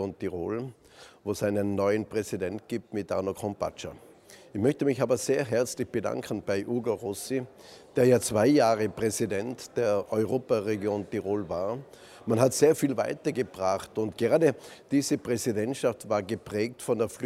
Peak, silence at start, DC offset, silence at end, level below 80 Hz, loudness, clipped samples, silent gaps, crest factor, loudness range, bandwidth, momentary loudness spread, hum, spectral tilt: -6 dBFS; 0 s; under 0.1%; 0 s; -64 dBFS; -28 LUFS; under 0.1%; none; 22 dB; 5 LU; 16 kHz; 11 LU; none; -5.5 dB/octave